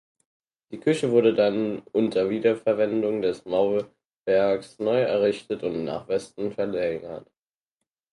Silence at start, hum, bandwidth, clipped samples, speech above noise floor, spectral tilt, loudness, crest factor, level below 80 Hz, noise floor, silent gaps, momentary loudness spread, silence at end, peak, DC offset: 0.7 s; none; 11.5 kHz; under 0.1%; 61 dB; -6.5 dB/octave; -25 LUFS; 18 dB; -64 dBFS; -85 dBFS; 4.05-4.10 s, 4.18-4.24 s; 10 LU; 0.9 s; -6 dBFS; under 0.1%